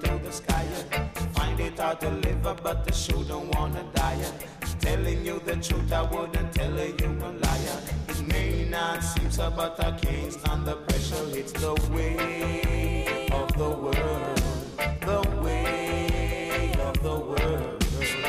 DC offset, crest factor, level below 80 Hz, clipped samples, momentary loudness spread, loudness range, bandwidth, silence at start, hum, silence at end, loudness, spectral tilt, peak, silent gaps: under 0.1%; 16 dB; -30 dBFS; under 0.1%; 3 LU; 1 LU; 15.5 kHz; 0 s; none; 0 s; -28 LUFS; -5 dB/octave; -10 dBFS; none